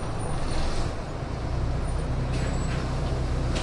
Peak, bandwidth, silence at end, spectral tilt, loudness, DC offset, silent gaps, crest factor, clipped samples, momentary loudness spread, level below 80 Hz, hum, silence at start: -14 dBFS; 11.5 kHz; 0 s; -6 dB/octave; -30 LUFS; under 0.1%; none; 12 dB; under 0.1%; 4 LU; -30 dBFS; none; 0 s